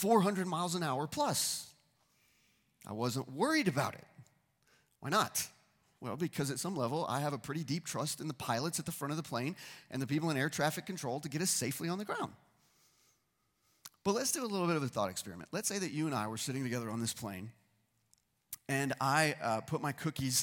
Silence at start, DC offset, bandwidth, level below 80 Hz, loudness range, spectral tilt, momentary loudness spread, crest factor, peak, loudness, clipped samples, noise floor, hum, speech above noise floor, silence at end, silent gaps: 0 s; under 0.1%; 17.5 kHz; -72 dBFS; 3 LU; -4 dB/octave; 12 LU; 24 dB; -14 dBFS; -35 LUFS; under 0.1%; -79 dBFS; none; 43 dB; 0 s; none